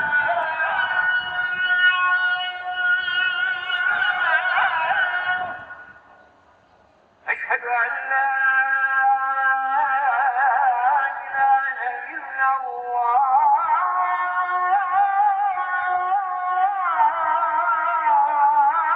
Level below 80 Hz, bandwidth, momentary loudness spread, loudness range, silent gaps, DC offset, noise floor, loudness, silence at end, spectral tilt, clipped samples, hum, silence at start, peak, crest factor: -68 dBFS; 4.9 kHz; 7 LU; 4 LU; none; under 0.1%; -56 dBFS; -20 LUFS; 0 s; -3.5 dB/octave; under 0.1%; none; 0 s; -8 dBFS; 14 dB